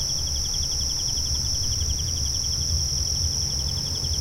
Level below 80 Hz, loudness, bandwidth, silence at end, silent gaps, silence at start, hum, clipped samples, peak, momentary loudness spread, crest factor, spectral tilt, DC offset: -32 dBFS; -23 LUFS; 16 kHz; 0 s; none; 0 s; none; under 0.1%; -12 dBFS; 2 LU; 12 dB; -2 dB/octave; under 0.1%